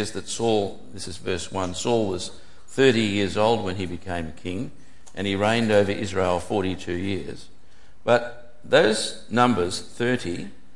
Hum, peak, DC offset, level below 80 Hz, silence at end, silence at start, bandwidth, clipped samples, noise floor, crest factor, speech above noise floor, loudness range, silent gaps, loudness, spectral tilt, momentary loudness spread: none; -4 dBFS; 2%; -54 dBFS; 0.25 s; 0 s; 11.5 kHz; under 0.1%; -56 dBFS; 22 dB; 32 dB; 2 LU; none; -24 LUFS; -4.5 dB/octave; 14 LU